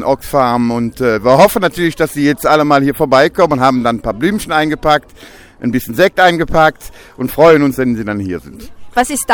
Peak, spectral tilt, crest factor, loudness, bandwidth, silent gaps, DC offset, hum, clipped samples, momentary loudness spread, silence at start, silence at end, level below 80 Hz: 0 dBFS; -5 dB/octave; 12 dB; -12 LUFS; over 20 kHz; none; under 0.1%; none; 0.1%; 10 LU; 0 s; 0 s; -36 dBFS